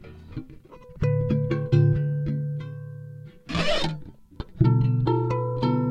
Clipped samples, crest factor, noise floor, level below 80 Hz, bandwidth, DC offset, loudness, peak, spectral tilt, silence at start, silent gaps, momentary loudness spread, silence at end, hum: under 0.1%; 18 dB; -46 dBFS; -42 dBFS; 9 kHz; under 0.1%; -24 LUFS; -8 dBFS; -7.5 dB/octave; 0 s; none; 19 LU; 0 s; none